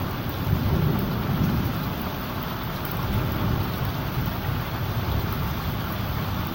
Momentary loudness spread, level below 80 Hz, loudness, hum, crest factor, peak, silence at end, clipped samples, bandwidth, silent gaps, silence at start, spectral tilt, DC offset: 5 LU; -34 dBFS; -27 LUFS; none; 16 dB; -10 dBFS; 0 s; under 0.1%; 17 kHz; none; 0 s; -6.5 dB/octave; 0.1%